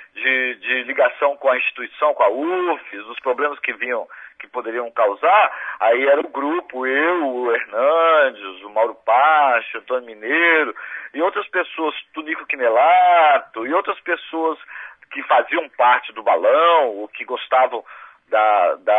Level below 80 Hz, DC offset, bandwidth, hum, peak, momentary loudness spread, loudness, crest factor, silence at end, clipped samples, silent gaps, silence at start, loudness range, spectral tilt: -76 dBFS; under 0.1%; 3.9 kHz; none; -2 dBFS; 13 LU; -18 LUFS; 16 dB; 0 s; under 0.1%; none; 0 s; 3 LU; -4 dB/octave